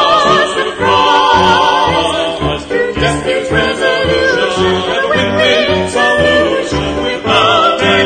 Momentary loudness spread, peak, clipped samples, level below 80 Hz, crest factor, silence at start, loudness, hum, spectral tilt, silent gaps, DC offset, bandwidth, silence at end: 7 LU; 0 dBFS; under 0.1%; -32 dBFS; 12 dB; 0 s; -11 LUFS; none; -4 dB/octave; none; under 0.1%; 9.4 kHz; 0 s